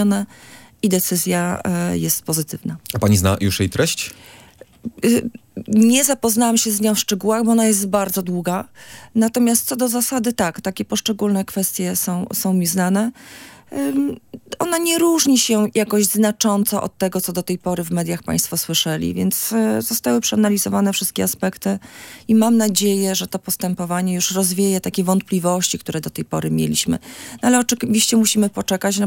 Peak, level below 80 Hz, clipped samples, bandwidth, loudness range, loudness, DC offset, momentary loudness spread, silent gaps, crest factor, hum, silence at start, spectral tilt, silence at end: 0 dBFS; -54 dBFS; under 0.1%; 17 kHz; 3 LU; -18 LUFS; under 0.1%; 10 LU; none; 18 dB; none; 0 s; -4 dB/octave; 0 s